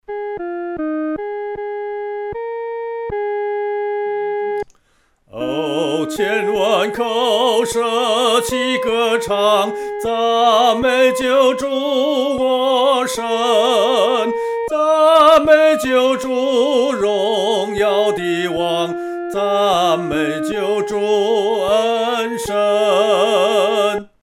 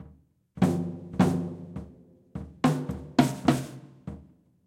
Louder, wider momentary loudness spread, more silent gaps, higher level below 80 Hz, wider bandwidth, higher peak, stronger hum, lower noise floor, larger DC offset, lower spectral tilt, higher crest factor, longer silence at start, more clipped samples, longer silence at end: first, -16 LUFS vs -27 LUFS; second, 11 LU vs 18 LU; neither; about the same, -50 dBFS vs -54 dBFS; about the same, 16.5 kHz vs 16 kHz; first, 0 dBFS vs -4 dBFS; neither; about the same, -59 dBFS vs -58 dBFS; neither; second, -3.5 dB/octave vs -6.5 dB/octave; second, 16 dB vs 24 dB; about the same, 0.1 s vs 0 s; neither; second, 0.15 s vs 0.45 s